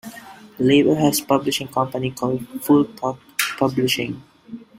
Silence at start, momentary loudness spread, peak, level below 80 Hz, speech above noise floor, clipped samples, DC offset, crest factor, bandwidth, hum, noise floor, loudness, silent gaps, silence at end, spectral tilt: 0.05 s; 19 LU; -2 dBFS; -58 dBFS; 22 dB; under 0.1%; under 0.1%; 20 dB; 16 kHz; none; -41 dBFS; -20 LUFS; none; 0.15 s; -4.5 dB/octave